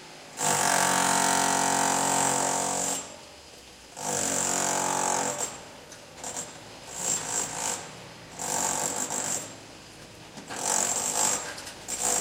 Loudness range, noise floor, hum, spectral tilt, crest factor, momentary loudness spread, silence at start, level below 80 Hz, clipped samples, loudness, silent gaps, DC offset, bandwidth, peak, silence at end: 7 LU; -48 dBFS; none; -1 dB/octave; 20 dB; 22 LU; 0 s; -64 dBFS; under 0.1%; -26 LUFS; none; under 0.1%; 17 kHz; -8 dBFS; 0 s